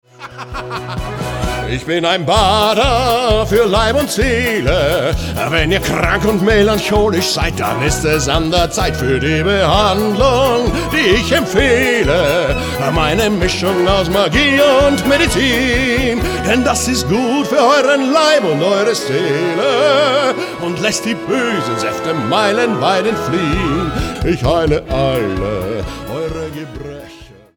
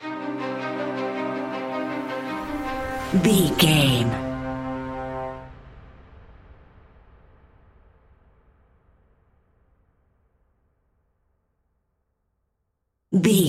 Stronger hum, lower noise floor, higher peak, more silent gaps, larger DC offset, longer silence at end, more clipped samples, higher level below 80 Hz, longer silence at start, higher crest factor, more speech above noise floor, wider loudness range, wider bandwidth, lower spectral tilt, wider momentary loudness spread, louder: neither; second, -38 dBFS vs -76 dBFS; first, 0 dBFS vs -4 dBFS; neither; neither; first, 0.3 s vs 0 s; neither; first, -26 dBFS vs -48 dBFS; first, 0.2 s vs 0 s; second, 14 dB vs 24 dB; second, 24 dB vs 58 dB; second, 3 LU vs 15 LU; first, 20 kHz vs 16 kHz; about the same, -4.5 dB/octave vs -5 dB/octave; second, 9 LU vs 14 LU; first, -14 LUFS vs -24 LUFS